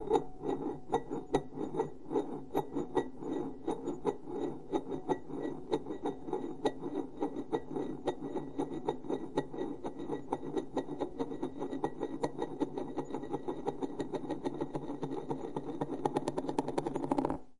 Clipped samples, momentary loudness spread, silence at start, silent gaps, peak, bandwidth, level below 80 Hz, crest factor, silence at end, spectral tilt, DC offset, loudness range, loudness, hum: under 0.1%; 5 LU; 0 s; none; -14 dBFS; 12 kHz; -60 dBFS; 22 dB; 0 s; -7 dB/octave; 0.5%; 2 LU; -38 LUFS; none